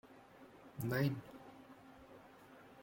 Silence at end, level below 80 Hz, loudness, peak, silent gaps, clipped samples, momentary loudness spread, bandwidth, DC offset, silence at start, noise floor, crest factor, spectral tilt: 0 s; -74 dBFS; -40 LUFS; -24 dBFS; none; under 0.1%; 23 LU; 16.5 kHz; under 0.1%; 0.05 s; -60 dBFS; 20 dB; -7 dB/octave